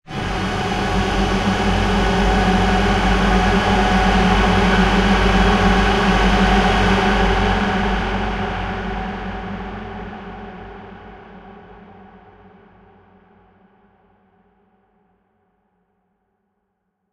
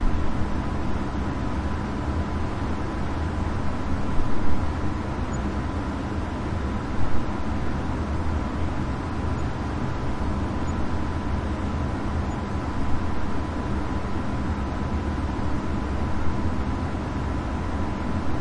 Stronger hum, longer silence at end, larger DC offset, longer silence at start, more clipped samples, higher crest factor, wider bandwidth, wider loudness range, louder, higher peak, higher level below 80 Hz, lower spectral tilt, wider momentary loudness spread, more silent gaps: neither; first, 5.35 s vs 0 s; neither; about the same, 0.1 s vs 0 s; neither; about the same, 16 dB vs 16 dB; first, 11.5 kHz vs 10 kHz; first, 18 LU vs 1 LU; first, -17 LUFS vs -28 LUFS; first, -2 dBFS vs -8 dBFS; first, -26 dBFS vs -32 dBFS; second, -5.5 dB/octave vs -7.5 dB/octave; first, 16 LU vs 1 LU; neither